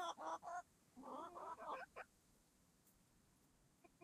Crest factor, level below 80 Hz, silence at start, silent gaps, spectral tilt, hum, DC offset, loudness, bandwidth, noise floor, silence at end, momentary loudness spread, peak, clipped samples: 18 dB; -84 dBFS; 0 s; none; -3 dB/octave; none; under 0.1%; -53 LUFS; 14 kHz; -76 dBFS; 0 s; 12 LU; -38 dBFS; under 0.1%